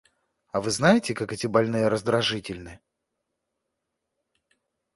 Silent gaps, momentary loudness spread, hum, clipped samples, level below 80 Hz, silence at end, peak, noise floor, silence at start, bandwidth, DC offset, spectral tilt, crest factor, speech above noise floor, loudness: none; 12 LU; none; under 0.1%; -58 dBFS; 2.2 s; -4 dBFS; -82 dBFS; 0.55 s; 11.5 kHz; under 0.1%; -4.5 dB/octave; 22 dB; 58 dB; -24 LUFS